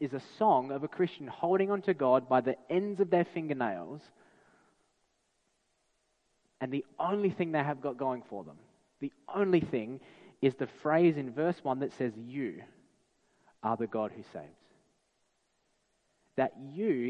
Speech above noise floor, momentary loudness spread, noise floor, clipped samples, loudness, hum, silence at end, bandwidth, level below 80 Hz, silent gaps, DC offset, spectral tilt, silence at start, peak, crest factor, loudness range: 45 dB; 16 LU; -76 dBFS; under 0.1%; -32 LUFS; none; 0 s; 8 kHz; -74 dBFS; none; under 0.1%; -8.5 dB/octave; 0 s; -14 dBFS; 20 dB; 10 LU